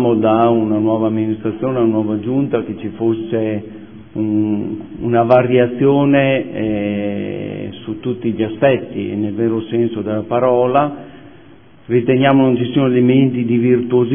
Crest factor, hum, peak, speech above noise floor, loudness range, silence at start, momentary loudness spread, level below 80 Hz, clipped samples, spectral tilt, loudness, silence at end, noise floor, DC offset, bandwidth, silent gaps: 16 dB; none; 0 dBFS; 29 dB; 4 LU; 0 s; 12 LU; -52 dBFS; under 0.1%; -11.5 dB/octave; -16 LUFS; 0 s; -44 dBFS; 0.5%; 3.6 kHz; none